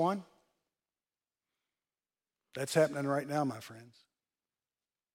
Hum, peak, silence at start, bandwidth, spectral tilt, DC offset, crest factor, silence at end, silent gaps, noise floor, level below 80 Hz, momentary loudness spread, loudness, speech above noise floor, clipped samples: none; -16 dBFS; 0 s; 16.5 kHz; -5.5 dB/octave; under 0.1%; 22 dB; 1.3 s; none; under -90 dBFS; -84 dBFS; 18 LU; -33 LUFS; over 57 dB; under 0.1%